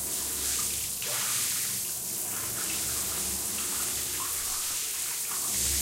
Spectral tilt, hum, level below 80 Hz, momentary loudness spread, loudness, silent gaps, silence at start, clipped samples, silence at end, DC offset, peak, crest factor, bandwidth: 0 dB/octave; none; -50 dBFS; 3 LU; -28 LUFS; none; 0 s; under 0.1%; 0 s; under 0.1%; -16 dBFS; 16 dB; 16 kHz